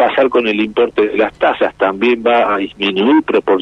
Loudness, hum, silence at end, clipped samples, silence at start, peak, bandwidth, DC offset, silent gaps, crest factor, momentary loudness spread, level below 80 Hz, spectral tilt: -14 LUFS; none; 0 s; under 0.1%; 0 s; -2 dBFS; 6.6 kHz; under 0.1%; none; 12 dB; 4 LU; -50 dBFS; -6.5 dB/octave